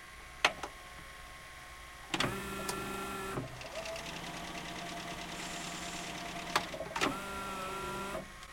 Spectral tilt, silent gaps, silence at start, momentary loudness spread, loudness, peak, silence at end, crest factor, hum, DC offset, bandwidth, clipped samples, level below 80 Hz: -3 dB/octave; none; 0 s; 14 LU; -38 LUFS; -10 dBFS; 0 s; 30 dB; none; under 0.1%; 16.5 kHz; under 0.1%; -56 dBFS